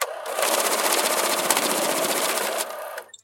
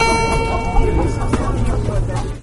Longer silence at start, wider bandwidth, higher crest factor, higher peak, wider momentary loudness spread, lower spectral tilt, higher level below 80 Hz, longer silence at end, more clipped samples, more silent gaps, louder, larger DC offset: about the same, 0 s vs 0 s; first, 17 kHz vs 11.5 kHz; first, 22 dB vs 14 dB; about the same, -2 dBFS vs -2 dBFS; first, 8 LU vs 4 LU; second, 0 dB/octave vs -5.5 dB/octave; second, -82 dBFS vs -20 dBFS; about the same, 0.05 s vs 0 s; neither; neither; second, -22 LUFS vs -19 LUFS; neither